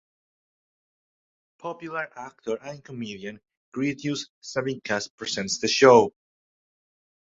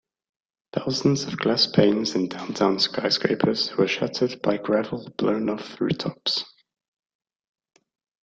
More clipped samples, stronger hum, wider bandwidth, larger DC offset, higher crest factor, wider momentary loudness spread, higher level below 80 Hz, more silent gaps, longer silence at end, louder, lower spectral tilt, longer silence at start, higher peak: neither; neither; about the same, 8 kHz vs 8.6 kHz; neither; about the same, 24 dB vs 22 dB; first, 21 LU vs 8 LU; about the same, -66 dBFS vs -62 dBFS; first, 3.57-3.72 s, 4.30-4.42 s, 5.10-5.18 s vs none; second, 1.1 s vs 1.75 s; about the same, -24 LUFS vs -23 LUFS; about the same, -4 dB/octave vs -5 dB/octave; first, 1.65 s vs 0.75 s; about the same, -2 dBFS vs -4 dBFS